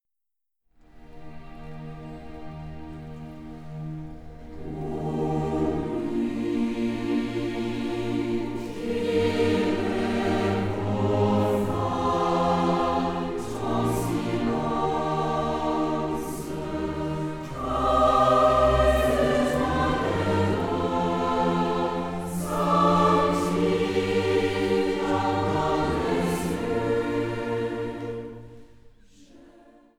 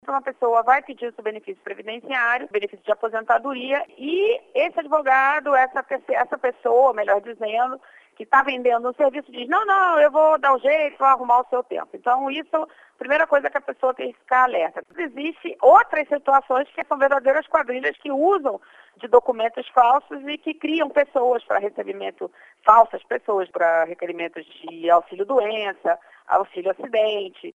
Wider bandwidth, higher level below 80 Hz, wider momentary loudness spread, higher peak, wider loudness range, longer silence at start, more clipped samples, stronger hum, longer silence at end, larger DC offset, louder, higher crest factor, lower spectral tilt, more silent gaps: first, 17.5 kHz vs 7.8 kHz; first, -42 dBFS vs -68 dBFS; first, 19 LU vs 14 LU; second, -8 dBFS vs 0 dBFS; first, 10 LU vs 4 LU; first, 0.95 s vs 0.05 s; neither; neither; first, 0.55 s vs 0.05 s; neither; second, -25 LUFS vs -21 LUFS; about the same, 16 dB vs 20 dB; first, -6.5 dB/octave vs -4.5 dB/octave; neither